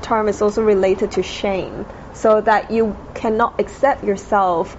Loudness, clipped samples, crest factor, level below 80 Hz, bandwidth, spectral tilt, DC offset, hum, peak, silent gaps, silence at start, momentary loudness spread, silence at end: -18 LUFS; under 0.1%; 14 dB; -40 dBFS; 8 kHz; -4.5 dB/octave; under 0.1%; none; -4 dBFS; none; 0 s; 8 LU; 0 s